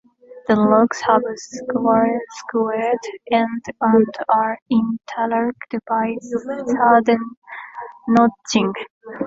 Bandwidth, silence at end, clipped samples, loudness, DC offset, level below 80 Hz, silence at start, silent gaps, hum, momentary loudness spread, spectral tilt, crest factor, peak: 7.8 kHz; 0 s; under 0.1%; -19 LUFS; under 0.1%; -60 dBFS; 0.3 s; 4.62-4.66 s, 7.37-7.42 s, 8.90-9.01 s; none; 15 LU; -5.5 dB/octave; 18 dB; 0 dBFS